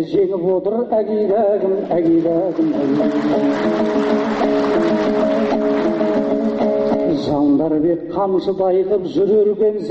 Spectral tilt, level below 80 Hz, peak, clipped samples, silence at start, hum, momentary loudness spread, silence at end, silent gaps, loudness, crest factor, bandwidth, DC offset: -7.5 dB/octave; -50 dBFS; -6 dBFS; under 0.1%; 0 s; none; 3 LU; 0 s; none; -17 LUFS; 10 dB; 7.8 kHz; under 0.1%